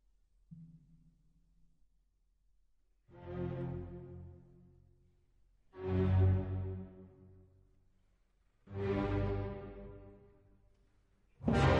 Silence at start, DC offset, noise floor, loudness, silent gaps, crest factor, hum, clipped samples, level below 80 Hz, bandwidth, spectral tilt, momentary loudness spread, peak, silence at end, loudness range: 0.5 s; under 0.1%; -74 dBFS; -37 LUFS; none; 22 dB; none; under 0.1%; -52 dBFS; 8.4 kHz; -8 dB/octave; 26 LU; -18 dBFS; 0 s; 10 LU